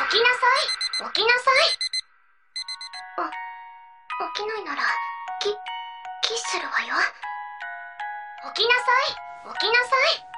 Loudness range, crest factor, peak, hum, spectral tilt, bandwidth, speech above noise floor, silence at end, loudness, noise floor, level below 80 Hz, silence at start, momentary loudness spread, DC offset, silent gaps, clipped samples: 7 LU; 22 dB; -2 dBFS; none; 0.5 dB/octave; 11 kHz; 39 dB; 0 s; -23 LUFS; -62 dBFS; -70 dBFS; 0 s; 17 LU; under 0.1%; none; under 0.1%